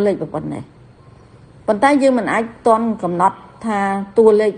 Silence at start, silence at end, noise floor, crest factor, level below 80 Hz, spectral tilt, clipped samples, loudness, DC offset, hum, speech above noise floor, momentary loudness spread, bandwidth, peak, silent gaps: 0 s; 0 s; -44 dBFS; 16 dB; -54 dBFS; -6.5 dB/octave; under 0.1%; -17 LUFS; under 0.1%; none; 28 dB; 14 LU; 10 kHz; 0 dBFS; none